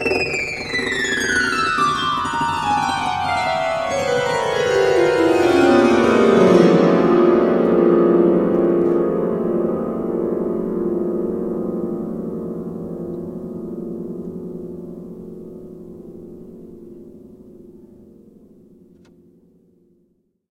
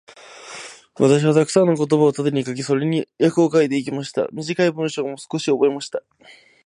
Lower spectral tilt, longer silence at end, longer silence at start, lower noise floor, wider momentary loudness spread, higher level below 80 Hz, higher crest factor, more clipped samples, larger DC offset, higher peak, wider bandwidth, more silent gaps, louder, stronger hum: about the same, -5.5 dB/octave vs -6 dB/octave; first, 2.75 s vs 0.65 s; second, 0 s vs 0.3 s; first, -64 dBFS vs -40 dBFS; first, 21 LU vs 16 LU; first, -50 dBFS vs -68 dBFS; about the same, 18 dB vs 18 dB; neither; neither; about the same, 0 dBFS vs -2 dBFS; about the same, 12.5 kHz vs 11.5 kHz; neither; about the same, -18 LUFS vs -19 LUFS; neither